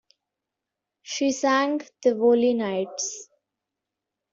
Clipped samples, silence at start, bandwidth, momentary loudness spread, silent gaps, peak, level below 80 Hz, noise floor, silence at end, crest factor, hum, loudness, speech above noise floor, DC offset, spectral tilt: under 0.1%; 1.05 s; 7.8 kHz; 11 LU; none; -8 dBFS; -72 dBFS; -86 dBFS; 1.1 s; 18 dB; none; -24 LUFS; 63 dB; under 0.1%; -3.5 dB/octave